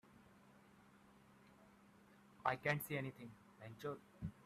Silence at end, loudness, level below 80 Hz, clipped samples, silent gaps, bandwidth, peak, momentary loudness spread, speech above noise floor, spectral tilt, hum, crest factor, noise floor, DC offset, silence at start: 0.05 s; -44 LUFS; -76 dBFS; under 0.1%; none; 14 kHz; -20 dBFS; 27 LU; 22 dB; -5.5 dB/octave; none; 28 dB; -67 dBFS; under 0.1%; 0.1 s